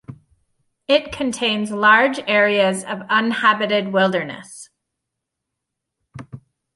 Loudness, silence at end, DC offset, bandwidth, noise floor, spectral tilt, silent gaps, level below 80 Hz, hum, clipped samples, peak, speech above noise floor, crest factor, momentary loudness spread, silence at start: -17 LUFS; 0.4 s; under 0.1%; 11.5 kHz; -81 dBFS; -4 dB/octave; none; -58 dBFS; none; under 0.1%; -2 dBFS; 63 dB; 18 dB; 22 LU; 0.1 s